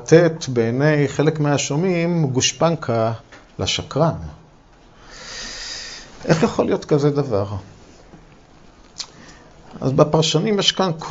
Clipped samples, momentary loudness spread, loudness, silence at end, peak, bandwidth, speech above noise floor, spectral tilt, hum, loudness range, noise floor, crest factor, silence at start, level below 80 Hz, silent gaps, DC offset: under 0.1%; 17 LU; -19 LUFS; 0 s; 0 dBFS; 8 kHz; 30 dB; -5 dB/octave; none; 6 LU; -48 dBFS; 20 dB; 0 s; -48 dBFS; none; under 0.1%